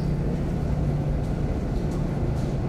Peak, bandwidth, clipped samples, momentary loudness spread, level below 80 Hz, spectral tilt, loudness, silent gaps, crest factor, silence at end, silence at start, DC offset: -14 dBFS; 11.5 kHz; under 0.1%; 2 LU; -30 dBFS; -8.5 dB/octave; -27 LUFS; none; 12 dB; 0 s; 0 s; under 0.1%